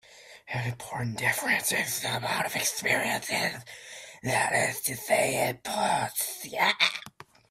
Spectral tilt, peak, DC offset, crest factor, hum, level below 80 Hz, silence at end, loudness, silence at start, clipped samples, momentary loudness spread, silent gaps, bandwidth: -2.5 dB/octave; -8 dBFS; under 0.1%; 22 dB; none; -64 dBFS; 0.4 s; -27 LUFS; 0.1 s; under 0.1%; 12 LU; none; 16 kHz